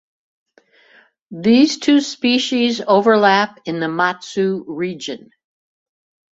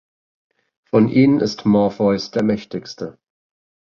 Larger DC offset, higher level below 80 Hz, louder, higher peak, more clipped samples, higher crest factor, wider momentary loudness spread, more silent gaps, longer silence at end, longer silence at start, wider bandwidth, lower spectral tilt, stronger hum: neither; second, -64 dBFS vs -54 dBFS; about the same, -16 LUFS vs -17 LUFS; about the same, -2 dBFS vs -2 dBFS; neither; about the same, 16 dB vs 18 dB; second, 12 LU vs 17 LU; neither; first, 1.15 s vs 0.75 s; first, 1.3 s vs 0.95 s; first, 8 kHz vs 7.2 kHz; second, -4.5 dB/octave vs -7.5 dB/octave; neither